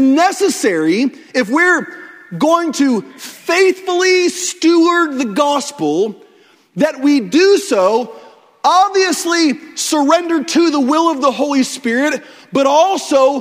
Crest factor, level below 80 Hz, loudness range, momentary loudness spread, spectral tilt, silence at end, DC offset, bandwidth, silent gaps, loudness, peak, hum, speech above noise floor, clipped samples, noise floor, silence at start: 14 dB; -64 dBFS; 1 LU; 8 LU; -3 dB/octave; 0 s; under 0.1%; 16 kHz; none; -14 LUFS; 0 dBFS; none; 35 dB; under 0.1%; -49 dBFS; 0 s